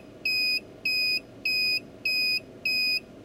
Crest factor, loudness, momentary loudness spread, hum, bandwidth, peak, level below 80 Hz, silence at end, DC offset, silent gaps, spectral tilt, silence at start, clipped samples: 12 dB; -25 LUFS; 4 LU; none; 16 kHz; -18 dBFS; -64 dBFS; 0 s; under 0.1%; none; -1 dB/octave; 0 s; under 0.1%